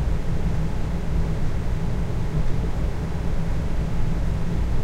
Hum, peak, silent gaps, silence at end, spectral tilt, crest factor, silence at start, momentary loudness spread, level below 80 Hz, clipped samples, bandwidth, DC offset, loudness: none; -10 dBFS; none; 0 s; -7.5 dB/octave; 12 dB; 0 s; 2 LU; -24 dBFS; under 0.1%; 9 kHz; under 0.1%; -27 LUFS